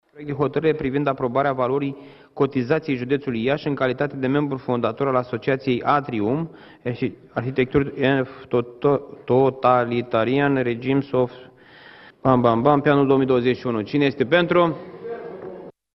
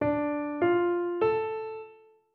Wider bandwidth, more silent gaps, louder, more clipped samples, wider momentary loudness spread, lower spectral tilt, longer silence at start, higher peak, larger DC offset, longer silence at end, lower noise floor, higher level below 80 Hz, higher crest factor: first, 6 kHz vs 4.3 kHz; neither; first, -21 LUFS vs -28 LUFS; neither; about the same, 12 LU vs 12 LU; about the same, -9.5 dB/octave vs -9.5 dB/octave; first, 0.15 s vs 0 s; first, -2 dBFS vs -14 dBFS; neither; second, 0.25 s vs 0.4 s; second, -47 dBFS vs -54 dBFS; first, -54 dBFS vs -64 dBFS; first, 20 dB vs 14 dB